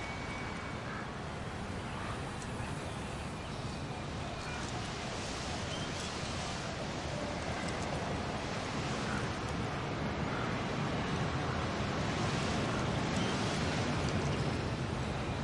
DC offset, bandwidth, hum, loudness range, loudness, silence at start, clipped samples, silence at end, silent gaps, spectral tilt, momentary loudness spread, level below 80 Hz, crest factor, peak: under 0.1%; 11.5 kHz; none; 6 LU; -37 LUFS; 0 s; under 0.1%; 0 s; none; -5 dB/octave; 7 LU; -50 dBFS; 16 dB; -20 dBFS